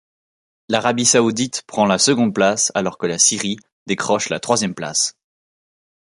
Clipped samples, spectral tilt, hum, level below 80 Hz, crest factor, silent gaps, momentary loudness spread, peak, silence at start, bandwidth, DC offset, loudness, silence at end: under 0.1%; -2.5 dB/octave; none; -60 dBFS; 20 dB; 3.72-3.86 s; 9 LU; 0 dBFS; 0.7 s; 11.5 kHz; under 0.1%; -17 LUFS; 1.05 s